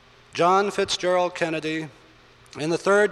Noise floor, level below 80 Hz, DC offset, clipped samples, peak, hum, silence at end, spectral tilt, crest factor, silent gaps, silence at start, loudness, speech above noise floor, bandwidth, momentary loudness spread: -52 dBFS; -62 dBFS; under 0.1%; under 0.1%; -8 dBFS; none; 0 s; -4 dB/octave; 16 dB; none; 0.35 s; -23 LUFS; 30 dB; 12 kHz; 14 LU